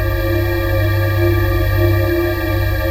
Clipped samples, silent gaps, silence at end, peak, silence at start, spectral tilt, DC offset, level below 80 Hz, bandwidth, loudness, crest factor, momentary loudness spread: under 0.1%; none; 0 s; -2 dBFS; 0 s; -7.5 dB/octave; under 0.1%; -22 dBFS; 16 kHz; -16 LUFS; 12 dB; 3 LU